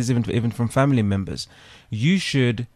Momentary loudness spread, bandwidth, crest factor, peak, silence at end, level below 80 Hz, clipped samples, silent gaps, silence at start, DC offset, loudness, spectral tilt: 13 LU; 13 kHz; 16 dB; -6 dBFS; 0.1 s; -50 dBFS; under 0.1%; none; 0 s; under 0.1%; -21 LUFS; -6 dB/octave